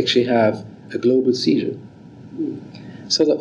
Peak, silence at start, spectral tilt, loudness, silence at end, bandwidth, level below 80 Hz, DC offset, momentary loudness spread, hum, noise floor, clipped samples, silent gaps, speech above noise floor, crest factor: -4 dBFS; 0 s; -5 dB/octave; -19 LUFS; 0 s; 10 kHz; -66 dBFS; under 0.1%; 19 LU; none; -40 dBFS; under 0.1%; none; 21 dB; 16 dB